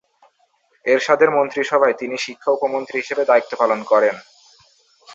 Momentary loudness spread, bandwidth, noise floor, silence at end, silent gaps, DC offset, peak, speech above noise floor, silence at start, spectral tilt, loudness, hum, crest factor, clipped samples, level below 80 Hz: 9 LU; 7.8 kHz; -62 dBFS; 0 s; none; under 0.1%; -2 dBFS; 44 dB; 0.85 s; -4 dB/octave; -18 LUFS; none; 18 dB; under 0.1%; -70 dBFS